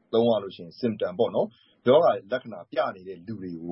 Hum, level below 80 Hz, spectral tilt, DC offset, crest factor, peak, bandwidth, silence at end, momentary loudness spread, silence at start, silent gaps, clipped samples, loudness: none; -70 dBFS; -10.5 dB/octave; under 0.1%; 18 dB; -8 dBFS; 5.8 kHz; 0 s; 17 LU; 0.1 s; none; under 0.1%; -26 LUFS